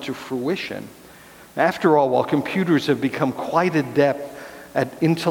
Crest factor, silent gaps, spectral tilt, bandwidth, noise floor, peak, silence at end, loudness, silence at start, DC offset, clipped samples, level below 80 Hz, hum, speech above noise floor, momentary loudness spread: 18 dB; none; -6.5 dB/octave; 19 kHz; -45 dBFS; -2 dBFS; 0 s; -21 LUFS; 0 s; under 0.1%; under 0.1%; -62 dBFS; none; 25 dB; 14 LU